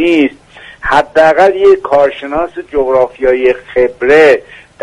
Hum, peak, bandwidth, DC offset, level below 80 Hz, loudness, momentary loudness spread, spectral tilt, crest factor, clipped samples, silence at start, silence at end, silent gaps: none; 0 dBFS; 11 kHz; under 0.1%; -38 dBFS; -10 LUFS; 10 LU; -5.5 dB/octave; 10 dB; 0.2%; 0 s; 0.25 s; none